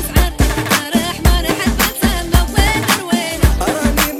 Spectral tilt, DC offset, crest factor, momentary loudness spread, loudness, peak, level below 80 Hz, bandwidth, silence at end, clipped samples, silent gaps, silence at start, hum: -4 dB/octave; under 0.1%; 12 dB; 3 LU; -15 LUFS; -2 dBFS; -18 dBFS; 17.5 kHz; 0 s; under 0.1%; none; 0 s; none